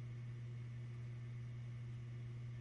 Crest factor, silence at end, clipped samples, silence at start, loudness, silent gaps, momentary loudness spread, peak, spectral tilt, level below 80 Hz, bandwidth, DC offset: 6 dB; 0 s; under 0.1%; 0 s; -50 LUFS; none; 0 LU; -42 dBFS; -8 dB/octave; -68 dBFS; 6.8 kHz; under 0.1%